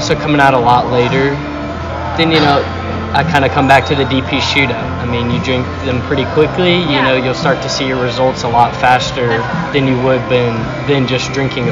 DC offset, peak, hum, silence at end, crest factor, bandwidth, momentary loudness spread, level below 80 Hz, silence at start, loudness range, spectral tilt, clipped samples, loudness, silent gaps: under 0.1%; 0 dBFS; none; 0 s; 12 dB; 11 kHz; 8 LU; -36 dBFS; 0 s; 1 LU; -5.5 dB/octave; 0.3%; -13 LUFS; none